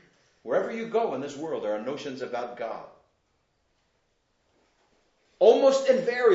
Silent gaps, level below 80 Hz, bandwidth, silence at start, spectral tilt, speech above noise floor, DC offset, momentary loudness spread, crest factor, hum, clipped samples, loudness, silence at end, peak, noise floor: none; -80 dBFS; 8 kHz; 0.45 s; -4.5 dB/octave; 46 dB; under 0.1%; 15 LU; 22 dB; none; under 0.1%; -26 LUFS; 0 s; -6 dBFS; -72 dBFS